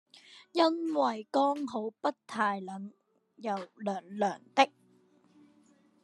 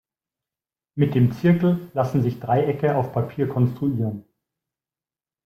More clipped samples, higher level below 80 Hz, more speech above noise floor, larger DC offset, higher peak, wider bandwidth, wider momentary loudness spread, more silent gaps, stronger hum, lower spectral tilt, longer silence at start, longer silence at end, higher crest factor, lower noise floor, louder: neither; second, under -90 dBFS vs -58 dBFS; second, 34 dB vs over 69 dB; neither; about the same, -8 dBFS vs -6 dBFS; second, 11.5 kHz vs 14.5 kHz; first, 11 LU vs 8 LU; neither; neither; second, -4.5 dB/octave vs -9.5 dB/octave; second, 0.3 s vs 0.95 s; about the same, 1.35 s vs 1.25 s; first, 26 dB vs 16 dB; second, -65 dBFS vs under -90 dBFS; second, -32 LUFS vs -22 LUFS